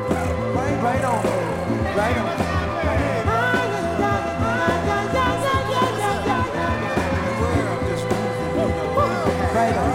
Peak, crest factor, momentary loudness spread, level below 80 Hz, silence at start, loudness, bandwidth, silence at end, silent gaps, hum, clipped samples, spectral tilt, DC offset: -6 dBFS; 14 dB; 3 LU; -38 dBFS; 0 s; -21 LUFS; 16.5 kHz; 0 s; none; none; under 0.1%; -6 dB/octave; under 0.1%